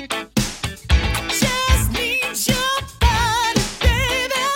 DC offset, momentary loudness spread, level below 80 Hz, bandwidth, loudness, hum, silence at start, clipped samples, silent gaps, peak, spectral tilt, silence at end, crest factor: under 0.1%; 5 LU; -24 dBFS; 17 kHz; -19 LUFS; none; 0 s; under 0.1%; none; -2 dBFS; -3.5 dB/octave; 0 s; 16 dB